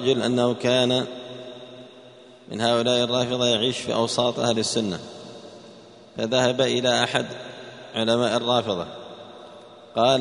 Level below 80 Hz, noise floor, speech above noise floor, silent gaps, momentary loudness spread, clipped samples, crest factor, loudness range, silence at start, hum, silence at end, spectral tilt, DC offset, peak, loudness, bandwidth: -62 dBFS; -47 dBFS; 25 dB; none; 21 LU; under 0.1%; 20 dB; 2 LU; 0 s; none; 0 s; -4 dB/octave; under 0.1%; -4 dBFS; -22 LUFS; 10.5 kHz